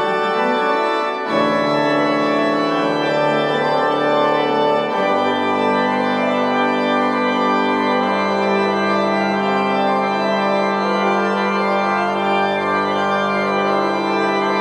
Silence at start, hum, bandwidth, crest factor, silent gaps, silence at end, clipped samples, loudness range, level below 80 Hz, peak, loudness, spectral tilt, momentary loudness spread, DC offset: 0 s; none; 12.5 kHz; 12 dB; none; 0 s; under 0.1%; 1 LU; -66 dBFS; -4 dBFS; -17 LUFS; -5.5 dB/octave; 1 LU; under 0.1%